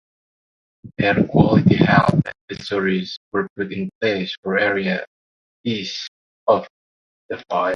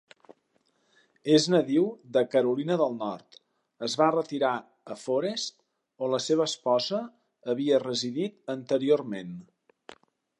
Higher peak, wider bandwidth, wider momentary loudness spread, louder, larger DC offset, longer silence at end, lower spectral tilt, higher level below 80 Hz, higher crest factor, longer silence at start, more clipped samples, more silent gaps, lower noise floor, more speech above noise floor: first, 0 dBFS vs -8 dBFS; second, 7.2 kHz vs 11.5 kHz; about the same, 16 LU vs 14 LU; first, -20 LUFS vs -27 LUFS; neither; second, 0 s vs 0.45 s; first, -7 dB/octave vs -5 dB/octave; first, -46 dBFS vs -80 dBFS; about the same, 20 dB vs 20 dB; second, 0.85 s vs 1.25 s; neither; first, 2.41-2.48 s, 3.17-3.31 s, 3.50-3.56 s, 3.95-4.01 s, 4.38-4.43 s, 5.07-5.64 s, 6.08-6.46 s, 6.70-7.29 s vs none; first, under -90 dBFS vs -71 dBFS; first, over 71 dB vs 45 dB